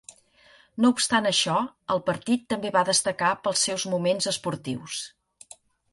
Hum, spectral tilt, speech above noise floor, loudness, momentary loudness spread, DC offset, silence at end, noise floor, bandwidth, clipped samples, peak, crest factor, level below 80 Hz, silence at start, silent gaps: none; -3 dB/octave; 32 dB; -25 LUFS; 11 LU; under 0.1%; 0.85 s; -57 dBFS; 11.5 kHz; under 0.1%; -8 dBFS; 18 dB; -66 dBFS; 0.75 s; none